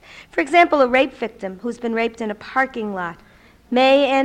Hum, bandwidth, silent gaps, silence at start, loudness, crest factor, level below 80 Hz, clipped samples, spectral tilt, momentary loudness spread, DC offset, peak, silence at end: none; 10 kHz; none; 0.15 s; -19 LUFS; 16 dB; -54 dBFS; under 0.1%; -4.5 dB/octave; 14 LU; under 0.1%; -2 dBFS; 0 s